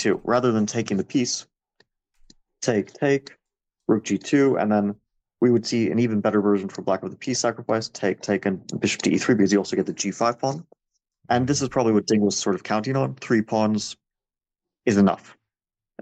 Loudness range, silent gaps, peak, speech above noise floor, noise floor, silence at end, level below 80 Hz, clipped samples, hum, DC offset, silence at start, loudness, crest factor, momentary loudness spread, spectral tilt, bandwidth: 3 LU; none; -8 dBFS; 67 dB; -89 dBFS; 0.8 s; -62 dBFS; under 0.1%; none; under 0.1%; 0 s; -23 LUFS; 16 dB; 8 LU; -5 dB/octave; 8.8 kHz